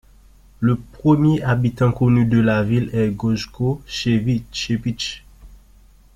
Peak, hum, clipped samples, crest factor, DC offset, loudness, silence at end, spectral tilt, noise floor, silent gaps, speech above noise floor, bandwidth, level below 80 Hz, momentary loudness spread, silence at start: -4 dBFS; none; under 0.1%; 16 dB; under 0.1%; -19 LUFS; 0.6 s; -7 dB/octave; -49 dBFS; none; 31 dB; 9.8 kHz; -42 dBFS; 8 LU; 0.6 s